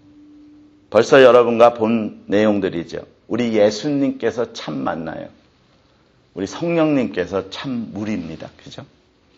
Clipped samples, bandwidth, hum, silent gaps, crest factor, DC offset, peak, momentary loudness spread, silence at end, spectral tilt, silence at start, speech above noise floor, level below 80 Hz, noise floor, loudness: under 0.1%; 8.2 kHz; none; none; 18 dB; under 0.1%; 0 dBFS; 22 LU; 0.55 s; -6 dB/octave; 0.9 s; 38 dB; -56 dBFS; -56 dBFS; -18 LUFS